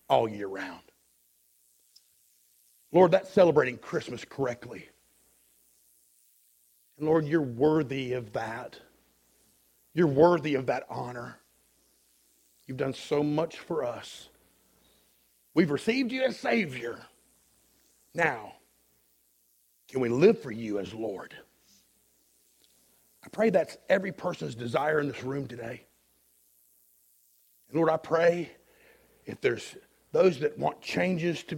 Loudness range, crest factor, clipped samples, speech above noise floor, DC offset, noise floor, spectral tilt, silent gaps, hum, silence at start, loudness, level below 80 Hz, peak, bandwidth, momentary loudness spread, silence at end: 7 LU; 22 dB; under 0.1%; 41 dB; under 0.1%; -68 dBFS; -6.5 dB/octave; none; none; 0.1 s; -28 LUFS; -68 dBFS; -8 dBFS; 17 kHz; 19 LU; 0 s